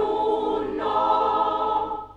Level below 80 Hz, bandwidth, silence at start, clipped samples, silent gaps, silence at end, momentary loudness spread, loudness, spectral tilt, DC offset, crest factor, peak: -52 dBFS; 7.6 kHz; 0 s; under 0.1%; none; 0.05 s; 5 LU; -23 LUFS; -6 dB/octave; under 0.1%; 12 dB; -10 dBFS